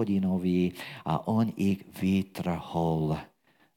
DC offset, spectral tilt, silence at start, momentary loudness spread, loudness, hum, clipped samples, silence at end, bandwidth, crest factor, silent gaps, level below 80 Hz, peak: under 0.1%; -8 dB/octave; 0 s; 6 LU; -29 LUFS; none; under 0.1%; 0.5 s; 16.5 kHz; 16 dB; none; -56 dBFS; -12 dBFS